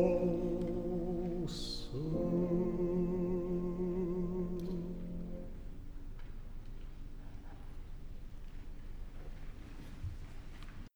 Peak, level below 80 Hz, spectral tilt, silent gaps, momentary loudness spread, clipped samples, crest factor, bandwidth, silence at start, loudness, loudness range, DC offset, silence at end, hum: -18 dBFS; -46 dBFS; -8 dB/octave; none; 18 LU; under 0.1%; 20 dB; over 20 kHz; 0 s; -38 LUFS; 16 LU; under 0.1%; 0.05 s; none